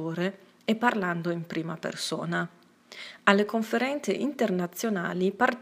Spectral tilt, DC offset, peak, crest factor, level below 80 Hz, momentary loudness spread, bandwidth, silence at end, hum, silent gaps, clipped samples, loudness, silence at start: -5 dB/octave; under 0.1%; -2 dBFS; 26 dB; -78 dBFS; 10 LU; 15.5 kHz; 0 s; none; none; under 0.1%; -28 LUFS; 0 s